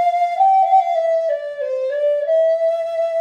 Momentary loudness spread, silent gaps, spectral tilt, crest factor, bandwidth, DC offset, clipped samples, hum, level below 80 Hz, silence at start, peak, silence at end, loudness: 8 LU; none; -1 dB/octave; 12 dB; 9 kHz; under 0.1%; under 0.1%; none; -80 dBFS; 0 s; -6 dBFS; 0 s; -17 LUFS